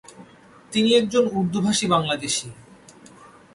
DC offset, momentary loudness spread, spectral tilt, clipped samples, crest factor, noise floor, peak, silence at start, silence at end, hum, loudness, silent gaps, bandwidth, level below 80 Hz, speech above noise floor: under 0.1%; 8 LU; -4 dB/octave; under 0.1%; 18 dB; -49 dBFS; -6 dBFS; 0.2 s; 0.3 s; none; -21 LUFS; none; 11.5 kHz; -58 dBFS; 28 dB